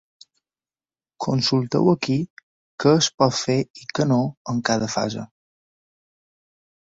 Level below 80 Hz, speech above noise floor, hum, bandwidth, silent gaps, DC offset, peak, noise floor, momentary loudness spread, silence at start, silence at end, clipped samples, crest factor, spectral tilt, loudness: -58 dBFS; over 69 dB; none; 8 kHz; 2.30-2.37 s, 2.43-2.78 s, 3.14-3.18 s, 3.70-3.74 s, 4.37-4.45 s; under 0.1%; -2 dBFS; under -90 dBFS; 11 LU; 1.2 s; 1.6 s; under 0.1%; 20 dB; -5 dB/octave; -21 LUFS